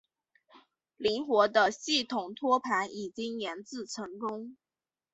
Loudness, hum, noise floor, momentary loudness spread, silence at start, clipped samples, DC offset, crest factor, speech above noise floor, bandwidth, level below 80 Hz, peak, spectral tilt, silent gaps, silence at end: -30 LUFS; none; under -90 dBFS; 14 LU; 0.55 s; under 0.1%; under 0.1%; 22 dB; over 59 dB; 8.2 kHz; -74 dBFS; -10 dBFS; -2.5 dB/octave; none; 0.6 s